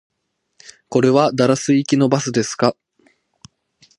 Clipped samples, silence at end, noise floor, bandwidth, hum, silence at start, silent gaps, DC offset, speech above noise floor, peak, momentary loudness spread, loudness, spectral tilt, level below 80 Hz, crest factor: under 0.1%; 1.25 s; -71 dBFS; 11.5 kHz; none; 0.9 s; none; under 0.1%; 54 dB; 0 dBFS; 5 LU; -17 LUFS; -5.5 dB/octave; -62 dBFS; 18 dB